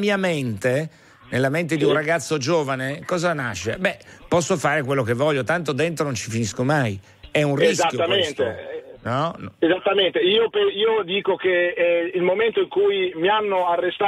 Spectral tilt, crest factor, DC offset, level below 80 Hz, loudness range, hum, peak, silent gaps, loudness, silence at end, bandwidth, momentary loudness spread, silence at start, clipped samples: -4.5 dB/octave; 14 dB; under 0.1%; -58 dBFS; 3 LU; none; -6 dBFS; none; -21 LUFS; 0 s; 14 kHz; 7 LU; 0 s; under 0.1%